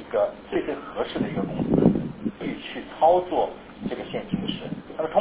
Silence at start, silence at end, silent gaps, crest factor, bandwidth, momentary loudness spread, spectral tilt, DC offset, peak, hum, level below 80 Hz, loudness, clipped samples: 0 s; 0 s; none; 22 dB; 4 kHz; 13 LU; -11 dB/octave; under 0.1%; -4 dBFS; none; -50 dBFS; -26 LUFS; under 0.1%